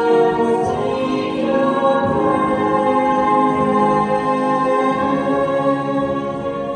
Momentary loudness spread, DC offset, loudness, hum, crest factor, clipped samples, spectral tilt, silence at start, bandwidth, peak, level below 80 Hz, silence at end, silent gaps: 4 LU; under 0.1%; -17 LUFS; none; 14 dB; under 0.1%; -7 dB/octave; 0 s; 9.8 kHz; -4 dBFS; -48 dBFS; 0 s; none